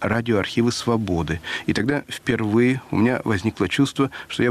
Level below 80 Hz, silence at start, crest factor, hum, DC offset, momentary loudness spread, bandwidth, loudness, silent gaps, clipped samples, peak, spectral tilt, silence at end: -46 dBFS; 0 s; 14 dB; none; under 0.1%; 5 LU; 14 kHz; -22 LUFS; none; under 0.1%; -8 dBFS; -6 dB/octave; 0 s